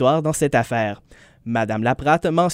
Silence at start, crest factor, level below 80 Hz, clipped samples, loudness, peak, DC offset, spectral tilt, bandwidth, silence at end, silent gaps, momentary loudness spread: 0 s; 16 dB; -48 dBFS; under 0.1%; -20 LUFS; -4 dBFS; under 0.1%; -5.5 dB/octave; 16 kHz; 0 s; none; 9 LU